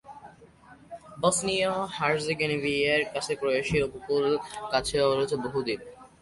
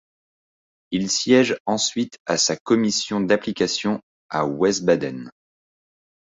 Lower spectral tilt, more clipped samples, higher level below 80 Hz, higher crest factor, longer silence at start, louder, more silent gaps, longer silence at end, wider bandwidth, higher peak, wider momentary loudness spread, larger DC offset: about the same, -3.5 dB/octave vs -3.5 dB/octave; neither; first, -54 dBFS vs -60 dBFS; about the same, 18 dB vs 20 dB; second, 0.05 s vs 0.9 s; second, -27 LUFS vs -21 LUFS; second, none vs 1.60-1.65 s, 2.20-2.25 s, 2.60-2.65 s, 4.03-4.29 s; second, 0.15 s vs 0.9 s; first, 11.5 kHz vs 8.2 kHz; second, -10 dBFS vs -4 dBFS; about the same, 8 LU vs 10 LU; neither